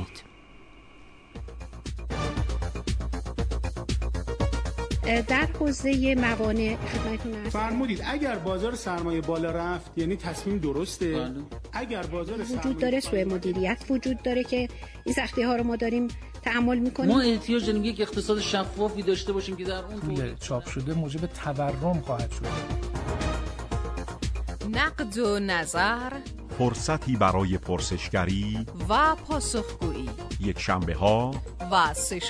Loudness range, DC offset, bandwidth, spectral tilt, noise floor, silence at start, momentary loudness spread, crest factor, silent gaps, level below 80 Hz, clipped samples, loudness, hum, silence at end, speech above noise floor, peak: 5 LU; under 0.1%; 11 kHz; -5 dB/octave; -49 dBFS; 0 s; 9 LU; 18 dB; none; -36 dBFS; under 0.1%; -28 LUFS; none; 0 s; 23 dB; -8 dBFS